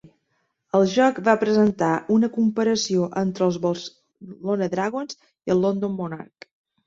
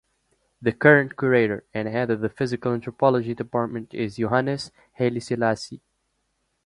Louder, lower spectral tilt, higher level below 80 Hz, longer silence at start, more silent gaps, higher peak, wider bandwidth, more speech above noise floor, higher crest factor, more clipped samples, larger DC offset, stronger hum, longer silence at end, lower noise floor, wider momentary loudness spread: about the same, -22 LUFS vs -23 LUFS; second, -5.5 dB/octave vs -7 dB/octave; about the same, -62 dBFS vs -60 dBFS; second, 0.05 s vs 0.6 s; neither; about the same, -4 dBFS vs -2 dBFS; second, 7.8 kHz vs 11.5 kHz; about the same, 51 dB vs 50 dB; about the same, 20 dB vs 22 dB; neither; neither; neither; second, 0.6 s vs 0.9 s; about the same, -72 dBFS vs -73 dBFS; about the same, 14 LU vs 12 LU